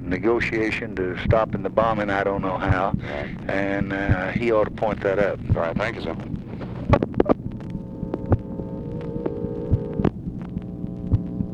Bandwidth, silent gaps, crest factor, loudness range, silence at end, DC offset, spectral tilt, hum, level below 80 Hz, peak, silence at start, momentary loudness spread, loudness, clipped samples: 8.8 kHz; none; 22 dB; 4 LU; 0 s; under 0.1%; -8.5 dB/octave; none; -36 dBFS; 0 dBFS; 0 s; 10 LU; -24 LUFS; under 0.1%